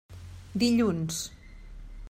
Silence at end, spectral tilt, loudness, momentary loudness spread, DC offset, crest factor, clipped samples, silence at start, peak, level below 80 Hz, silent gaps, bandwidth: 0 s; -5 dB/octave; -28 LUFS; 25 LU; under 0.1%; 18 dB; under 0.1%; 0.1 s; -14 dBFS; -48 dBFS; none; 16 kHz